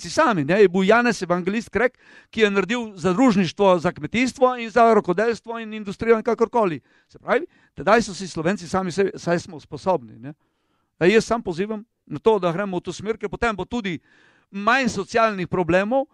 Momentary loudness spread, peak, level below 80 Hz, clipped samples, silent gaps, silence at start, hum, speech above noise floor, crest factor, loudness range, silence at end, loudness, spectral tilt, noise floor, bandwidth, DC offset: 13 LU; -4 dBFS; -52 dBFS; under 0.1%; none; 0 s; none; 49 dB; 18 dB; 4 LU; 0.1 s; -21 LUFS; -5.5 dB/octave; -70 dBFS; 11.5 kHz; under 0.1%